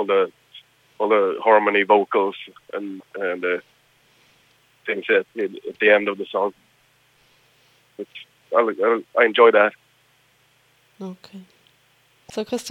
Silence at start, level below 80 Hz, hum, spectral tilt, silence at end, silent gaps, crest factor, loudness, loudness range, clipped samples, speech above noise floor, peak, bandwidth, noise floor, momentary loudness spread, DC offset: 0 s; -76 dBFS; none; -4.5 dB/octave; 0 s; none; 22 dB; -20 LUFS; 6 LU; under 0.1%; 40 dB; 0 dBFS; 11.5 kHz; -60 dBFS; 21 LU; under 0.1%